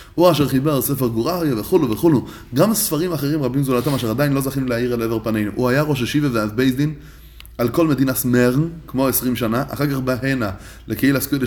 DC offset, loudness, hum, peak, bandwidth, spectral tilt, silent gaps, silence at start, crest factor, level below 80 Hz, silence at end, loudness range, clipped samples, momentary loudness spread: under 0.1%; -19 LUFS; none; -2 dBFS; 20 kHz; -5.5 dB/octave; none; 0 s; 16 dB; -42 dBFS; 0 s; 1 LU; under 0.1%; 6 LU